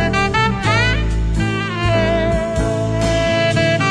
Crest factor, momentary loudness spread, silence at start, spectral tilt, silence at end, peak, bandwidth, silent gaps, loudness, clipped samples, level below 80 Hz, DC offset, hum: 12 dB; 4 LU; 0 s; -5.5 dB/octave; 0 s; -4 dBFS; 10.5 kHz; none; -17 LUFS; under 0.1%; -24 dBFS; under 0.1%; none